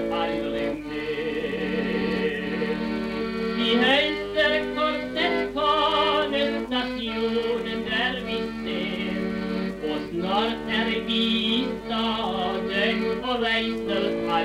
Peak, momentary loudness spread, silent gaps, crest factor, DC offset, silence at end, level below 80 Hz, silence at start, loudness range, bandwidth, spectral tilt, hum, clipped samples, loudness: -8 dBFS; 7 LU; none; 18 dB; under 0.1%; 0 s; -48 dBFS; 0 s; 5 LU; 14.5 kHz; -5.5 dB/octave; none; under 0.1%; -25 LUFS